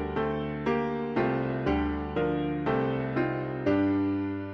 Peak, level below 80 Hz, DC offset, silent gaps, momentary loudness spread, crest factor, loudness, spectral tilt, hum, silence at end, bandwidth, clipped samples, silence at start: -14 dBFS; -46 dBFS; under 0.1%; none; 4 LU; 14 dB; -29 LUFS; -9 dB/octave; none; 0 s; 6.2 kHz; under 0.1%; 0 s